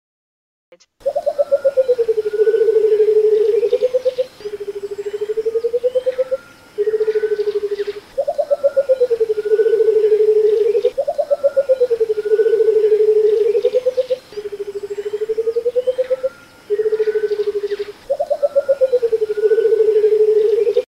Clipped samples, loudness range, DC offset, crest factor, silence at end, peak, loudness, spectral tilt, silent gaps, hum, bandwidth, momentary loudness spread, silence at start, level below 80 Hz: under 0.1%; 5 LU; under 0.1%; 12 dB; 0.05 s; -4 dBFS; -17 LUFS; -4.5 dB/octave; none; none; 9.6 kHz; 11 LU; 1.05 s; -58 dBFS